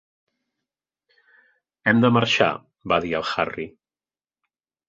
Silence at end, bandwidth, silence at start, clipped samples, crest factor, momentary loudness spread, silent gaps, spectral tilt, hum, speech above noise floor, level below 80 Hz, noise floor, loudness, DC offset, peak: 1.2 s; 7.8 kHz; 1.85 s; under 0.1%; 22 dB; 16 LU; none; -5.5 dB/octave; none; over 69 dB; -56 dBFS; under -90 dBFS; -21 LUFS; under 0.1%; -2 dBFS